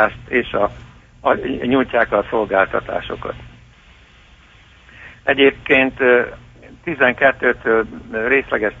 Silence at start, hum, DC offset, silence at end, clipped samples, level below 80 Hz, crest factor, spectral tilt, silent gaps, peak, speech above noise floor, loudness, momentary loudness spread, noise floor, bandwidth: 0 s; none; under 0.1%; 0 s; under 0.1%; -44 dBFS; 18 dB; -6.5 dB/octave; none; -2 dBFS; 30 dB; -17 LUFS; 12 LU; -47 dBFS; 7.4 kHz